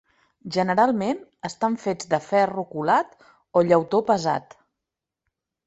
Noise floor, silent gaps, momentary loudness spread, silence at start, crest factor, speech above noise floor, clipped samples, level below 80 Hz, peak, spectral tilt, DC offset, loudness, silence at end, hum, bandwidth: -86 dBFS; none; 10 LU; 0.45 s; 20 dB; 63 dB; under 0.1%; -66 dBFS; -4 dBFS; -6 dB/octave; under 0.1%; -23 LUFS; 1.25 s; none; 8.2 kHz